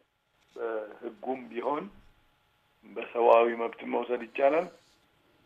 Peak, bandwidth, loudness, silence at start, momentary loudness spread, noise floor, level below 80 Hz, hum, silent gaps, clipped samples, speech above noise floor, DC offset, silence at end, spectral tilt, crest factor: -8 dBFS; 7.2 kHz; -29 LUFS; 0.55 s; 19 LU; -70 dBFS; -72 dBFS; none; none; under 0.1%; 42 dB; under 0.1%; 0.75 s; -6.5 dB/octave; 24 dB